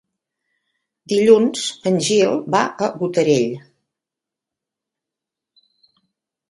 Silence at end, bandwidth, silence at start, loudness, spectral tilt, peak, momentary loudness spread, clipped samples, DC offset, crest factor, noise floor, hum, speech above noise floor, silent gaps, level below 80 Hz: 2.9 s; 11.5 kHz; 1.1 s; -17 LUFS; -4.5 dB/octave; 0 dBFS; 9 LU; under 0.1%; under 0.1%; 20 dB; -86 dBFS; none; 69 dB; none; -66 dBFS